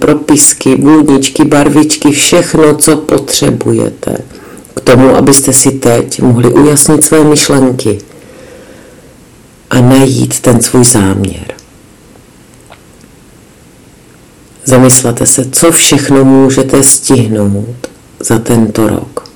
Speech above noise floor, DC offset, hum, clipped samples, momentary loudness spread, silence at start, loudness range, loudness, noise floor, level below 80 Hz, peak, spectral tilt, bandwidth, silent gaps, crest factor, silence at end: 31 dB; under 0.1%; none; 9%; 12 LU; 0 s; 6 LU; -6 LUFS; -38 dBFS; -36 dBFS; 0 dBFS; -4.5 dB/octave; over 20 kHz; none; 8 dB; 0.1 s